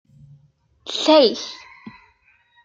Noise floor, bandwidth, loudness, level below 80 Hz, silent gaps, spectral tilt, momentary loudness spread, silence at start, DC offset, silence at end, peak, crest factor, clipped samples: -59 dBFS; 7.8 kHz; -17 LUFS; -66 dBFS; none; -3 dB/octave; 24 LU; 0.85 s; under 0.1%; 0.75 s; -2 dBFS; 20 dB; under 0.1%